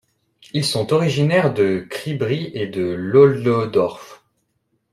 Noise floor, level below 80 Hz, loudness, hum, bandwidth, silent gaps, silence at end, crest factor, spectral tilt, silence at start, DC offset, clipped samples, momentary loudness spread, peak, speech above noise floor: -69 dBFS; -58 dBFS; -19 LUFS; none; 13.5 kHz; none; 0.75 s; 18 dB; -6 dB/octave; 0.55 s; under 0.1%; under 0.1%; 12 LU; -2 dBFS; 51 dB